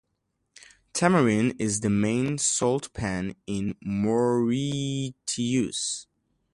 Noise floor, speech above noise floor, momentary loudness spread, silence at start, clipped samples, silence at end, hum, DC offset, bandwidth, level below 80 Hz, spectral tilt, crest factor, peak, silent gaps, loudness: -77 dBFS; 52 dB; 9 LU; 0.95 s; under 0.1%; 0.5 s; none; under 0.1%; 11.5 kHz; -54 dBFS; -4.5 dB/octave; 20 dB; -6 dBFS; none; -26 LUFS